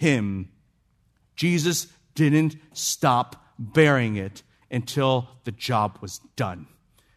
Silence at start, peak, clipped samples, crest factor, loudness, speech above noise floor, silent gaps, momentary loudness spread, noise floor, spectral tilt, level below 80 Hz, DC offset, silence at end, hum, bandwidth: 0 s; -4 dBFS; under 0.1%; 20 dB; -24 LUFS; 42 dB; none; 17 LU; -66 dBFS; -5 dB/octave; -64 dBFS; under 0.1%; 0.55 s; none; 14 kHz